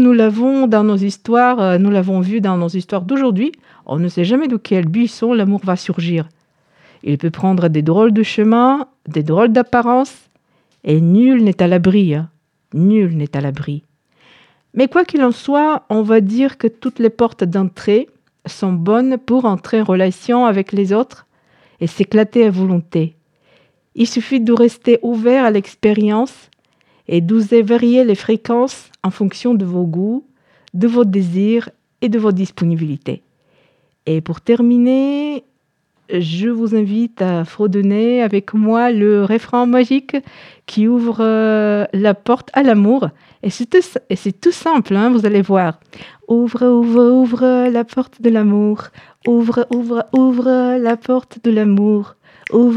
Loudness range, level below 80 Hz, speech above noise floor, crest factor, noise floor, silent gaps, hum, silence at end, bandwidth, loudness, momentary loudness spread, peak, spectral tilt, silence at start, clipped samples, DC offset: 3 LU; -60 dBFS; 51 dB; 14 dB; -65 dBFS; none; none; 0 s; 9.8 kHz; -15 LUFS; 10 LU; -2 dBFS; -8 dB/octave; 0 s; under 0.1%; under 0.1%